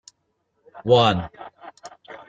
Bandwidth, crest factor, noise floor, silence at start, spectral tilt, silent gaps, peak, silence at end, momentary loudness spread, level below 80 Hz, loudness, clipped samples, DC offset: 7.8 kHz; 22 dB; -72 dBFS; 0.75 s; -6 dB/octave; none; -2 dBFS; 0.15 s; 25 LU; -54 dBFS; -19 LUFS; under 0.1%; under 0.1%